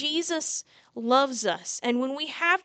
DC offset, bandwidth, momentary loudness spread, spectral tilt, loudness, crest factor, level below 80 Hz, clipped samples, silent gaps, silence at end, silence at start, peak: under 0.1%; 9.4 kHz; 11 LU; -1.5 dB/octave; -27 LUFS; 20 dB; -82 dBFS; under 0.1%; none; 0.05 s; 0 s; -6 dBFS